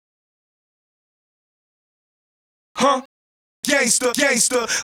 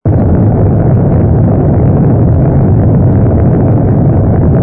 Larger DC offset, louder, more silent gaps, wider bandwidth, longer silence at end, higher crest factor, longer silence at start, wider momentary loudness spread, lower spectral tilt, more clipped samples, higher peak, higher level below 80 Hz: neither; second, -18 LUFS vs -8 LUFS; first, 3.05-3.63 s vs none; first, 18.5 kHz vs 2.6 kHz; about the same, 0.05 s vs 0 s; first, 24 dB vs 6 dB; first, 2.75 s vs 0.05 s; first, 10 LU vs 1 LU; second, -1 dB/octave vs -15.5 dB/octave; neither; about the same, 0 dBFS vs 0 dBFS; second, -64 dBFS vs -18 dBFS